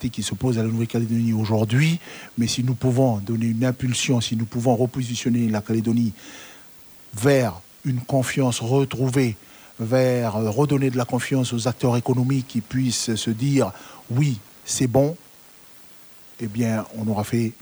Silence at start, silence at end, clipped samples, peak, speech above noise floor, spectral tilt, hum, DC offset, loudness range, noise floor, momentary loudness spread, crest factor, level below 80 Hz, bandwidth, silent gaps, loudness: 0 s; 0.1 s; under 0.1%; -6 dBFS; 26 dB; -6 dB/octave; none; under 0.1%; 2 LU; -48 dBFS; 13 LU; 18 dB; -54 dBFS; over 20 kHz; none; -22 LUFS